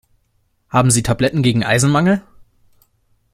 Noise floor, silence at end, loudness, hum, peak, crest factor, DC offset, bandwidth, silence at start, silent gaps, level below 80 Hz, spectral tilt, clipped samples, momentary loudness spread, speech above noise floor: -63 dBFS; 1.15 s; -15 LUFS; none; -2 dBFS; 16 dB; under 0.1%; 14.5 kHz; 0.75 s; none; -42 dBFS; -5 dB/octave; under 0.1%; 4 LU; 49 dB